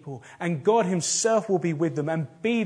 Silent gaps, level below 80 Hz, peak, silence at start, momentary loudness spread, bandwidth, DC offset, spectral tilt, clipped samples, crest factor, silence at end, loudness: none; -74 dBFS; -10 dBFS; 0.05 s; 8 LU; 10.5 kHz; under 0.1%; -4.5 dB/octave; under 0.1%; 16 dB; 0 s; -25 LUFS